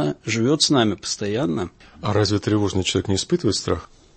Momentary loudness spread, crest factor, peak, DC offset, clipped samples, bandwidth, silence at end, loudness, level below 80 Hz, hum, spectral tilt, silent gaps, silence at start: 10 LU; 16 dB; -4 dBFS; under 0.1%; under 0.1%; 8.8 kHz; 0.3 s; -21 LUFS; -48 dBFS; none; -4.5 dB/octave; none; 0 s